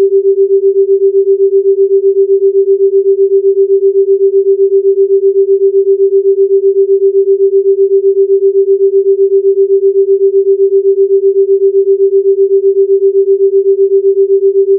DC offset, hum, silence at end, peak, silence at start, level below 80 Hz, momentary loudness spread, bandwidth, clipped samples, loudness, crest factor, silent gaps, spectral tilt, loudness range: under 0.1%; none; 0 s; -2 dBFS; 0 s; -86 dBFS; 0 LU; 0.5 kHz; under 0.1%; -9 LUFS; 6 dB; none; -14.5 dB/octave; 0 LU